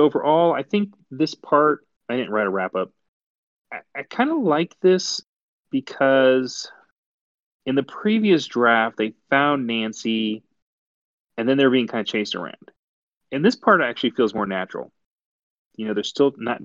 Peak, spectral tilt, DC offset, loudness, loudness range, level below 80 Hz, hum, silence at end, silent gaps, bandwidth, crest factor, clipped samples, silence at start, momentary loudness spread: -2 dBFS; -5 dB/octave; under 0.1%; -21 LUFS; 3 LU; -72 dBFS; none; 0 s; 3.08-3.65 s, 5.26-5.65 s, 6.92-7.60 s, 10.62-11.28 s, 12.78-13.21 s, 15.06-15.19 s, 15.25-15.71 s; 7.8 kHz; 20 dB; under 0.1%; 0 s; 14 LU